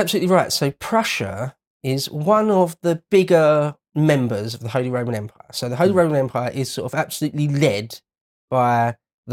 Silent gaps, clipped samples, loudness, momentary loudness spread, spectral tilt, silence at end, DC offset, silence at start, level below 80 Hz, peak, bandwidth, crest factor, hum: 1.67-1.80 s, 8.21-8.48 s, 9.14-9.23 s; under 0.1%; -20 LUFS; 11 LU; -5.5 dB/octave; 0 s; under 0.1%; 0 s; -60 dBFS; -2 dBFS; 17 kHz; 16 dB; none